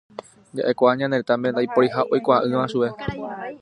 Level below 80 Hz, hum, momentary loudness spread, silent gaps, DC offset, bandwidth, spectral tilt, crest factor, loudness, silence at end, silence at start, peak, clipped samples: -54 dBFS; none; 13 LU; none; under 0.1%; 11 kHz; -7 dB/octave; 18 dB; -21 LUFS; 0.05 s; 0.55 s; -2 dBFS; under 0.1%